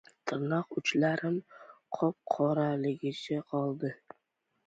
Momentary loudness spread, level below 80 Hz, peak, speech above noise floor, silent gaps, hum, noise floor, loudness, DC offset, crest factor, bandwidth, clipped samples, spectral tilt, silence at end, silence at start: 9 LU; -76 dBFS; -14 dBFS; 48 dB; none; none; -80 dBFS; -32 LUFS; under 0.1%; 20 dB; 8 kHz; under 0.1%; -6.5 dB/octave; 0.7 s; 0.25 s